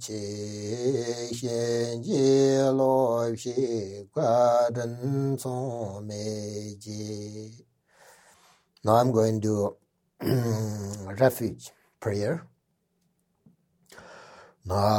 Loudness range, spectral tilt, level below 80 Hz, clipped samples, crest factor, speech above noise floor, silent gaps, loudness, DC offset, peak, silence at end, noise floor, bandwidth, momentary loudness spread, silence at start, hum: 11 LU; -6 dB/octave; -64 dBFS; under 0.1%; 20 dB; 47 dB; none; -27 LUFS; under 0.1%; -8 dBFS; 0 s; -74 dBFS; 17.5 kHz; 15 LU; 0 s; none